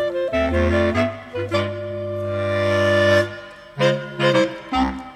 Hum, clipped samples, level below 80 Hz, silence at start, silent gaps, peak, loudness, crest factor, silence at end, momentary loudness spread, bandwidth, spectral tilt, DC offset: none; under 0.1%; -38 dBFS; 0 s; none; -4 dBFS; -20 LUFS; 16 dB; 0 s; 10 LU; 13.5 kHz; -6 dB/octave; under 0.1%